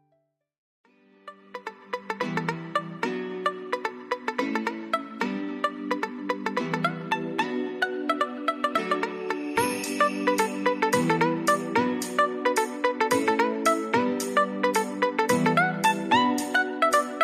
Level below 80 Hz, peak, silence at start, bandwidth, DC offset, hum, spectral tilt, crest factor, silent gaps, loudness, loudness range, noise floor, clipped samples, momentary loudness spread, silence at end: -72 dBFS; -8 dBFS; 1.25 s; 14.5 kHz; under 0.1%; none; -4 dB/octave; 20 dB; none; -26 LUFS; 7 LU; -72 dBFS; under 0.1%; 8 LU; 0 s